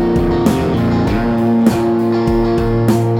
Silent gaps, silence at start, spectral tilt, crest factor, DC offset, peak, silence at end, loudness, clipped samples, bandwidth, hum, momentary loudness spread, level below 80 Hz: none; 0 s; -7.5 dB/octave; 14 dB; under 0.1%; 0 dBFS; 0 s; -14 LUFS; under 0.1%; 17 kHz; none; 2 LU; -28 dBFS